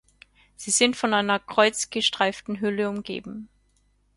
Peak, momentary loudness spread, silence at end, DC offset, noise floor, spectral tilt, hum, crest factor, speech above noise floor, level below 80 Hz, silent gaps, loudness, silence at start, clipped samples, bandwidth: -4 dBFS; 14 LU; 0.7 s; under 0.1%; -65 dBFS; -2 dB/octave; 50 Hz at -60 dBFS; 22 dB; 41 dB; -62 dBFS; none; -23 LUFS; 0.6 s; under 0.1%; 11.5 kHz